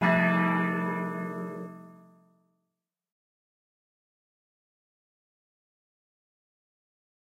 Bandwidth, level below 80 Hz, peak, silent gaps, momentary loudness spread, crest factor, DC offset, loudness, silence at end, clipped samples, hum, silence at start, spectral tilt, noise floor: 6.4 kHz; -74 dBFS; -12 dBFS; none; 19 LU; 22 dB; under 0.1%; -28 LUFS; 5.45 s; under 0.1%; none; 0 s; -8 dB/octave; -86 dBFS